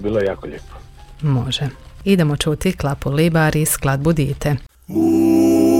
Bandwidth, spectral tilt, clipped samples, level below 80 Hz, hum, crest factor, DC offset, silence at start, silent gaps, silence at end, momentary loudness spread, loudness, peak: 17 kHz; -6 dB/octave; under 0.1%; -36 dBFS; none; 14 dB; under 0.1%; 0 s; none; 0 s; 12 LU; -18 LUFS; -2 dBFS